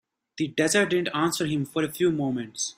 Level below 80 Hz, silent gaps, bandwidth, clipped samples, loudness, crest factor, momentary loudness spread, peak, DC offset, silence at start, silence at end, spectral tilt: -64 dBFS; none; 16 kHz; under 0.1%; -25 LUFS; 18 dB; 7 LU; -8 dBFS; under 0.1%; 0.35 s; 0.05 s; -4 dB/octave